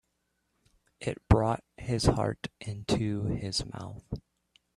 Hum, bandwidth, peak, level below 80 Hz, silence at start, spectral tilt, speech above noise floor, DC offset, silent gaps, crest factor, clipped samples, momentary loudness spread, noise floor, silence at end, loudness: none; 12.5 kHz; -6 dBFS; -42 dBFS; 1 s; -6 dB/octave; 48 dB; under 0.1%; none; 24 dB; under 0.1%; 15 LU; -78 dBFS; 0.6 s; -31 LUFS